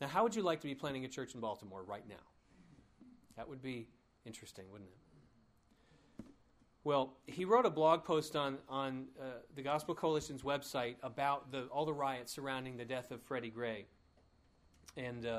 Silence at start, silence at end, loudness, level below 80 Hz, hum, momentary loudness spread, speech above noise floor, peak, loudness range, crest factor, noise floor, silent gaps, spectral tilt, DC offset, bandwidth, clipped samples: 0 s; 0 s; -39 LUFS; -72 dBFS; none; 21 LU; 31 dB; -16 dBFS; 17 LU; 24 dB; -70 dBFS; none; -5 dB/octave; under 0.1%; 15.5 kHz; under 0.1%